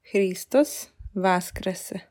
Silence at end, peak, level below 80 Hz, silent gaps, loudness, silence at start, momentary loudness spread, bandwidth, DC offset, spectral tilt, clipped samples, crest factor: 0.1 s; -8 dBFS; -48 dBFS; none; -25 LUFS; 0.1 s; 12 LU; 18 kHz; under 0.1%; -5 dB/octave; under 0.1%; 16 dB